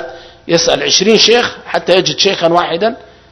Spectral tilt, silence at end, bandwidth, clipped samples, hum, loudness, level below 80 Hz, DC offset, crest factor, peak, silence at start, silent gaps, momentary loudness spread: -2.5 dB/octave; 0.35 s; 11 kHz; 0.3%; none; -11 LUFS; -46 dBFS; under 0.1%; 12 dB; 0 dBFS; 0 s; none; 10 LU